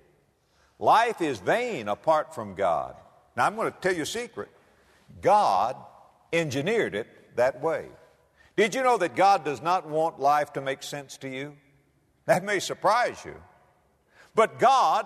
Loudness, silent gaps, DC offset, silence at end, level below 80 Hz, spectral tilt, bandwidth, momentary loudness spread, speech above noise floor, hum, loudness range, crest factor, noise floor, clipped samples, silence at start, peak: -25 LUFS; none; under 0.1%; 0 s; -66 dBFS; -4 dB/octave; 13.5 kHz; 16 LU; 41 dB; none; 4 LU; 18 dB; -66 dBFS; under 0.1%; 0.8 s; -8 dBFS